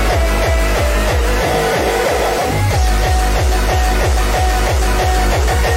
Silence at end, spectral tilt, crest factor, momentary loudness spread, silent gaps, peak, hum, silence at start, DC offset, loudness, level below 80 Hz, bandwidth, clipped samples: 0 s; -4.5 dB/octave; 8 dB; 1 LU; none; -4 dBFS; none; 0 s; under 0.1%; -15 LUFS; -16 dBFS; 16.5 kHz; under 0.1%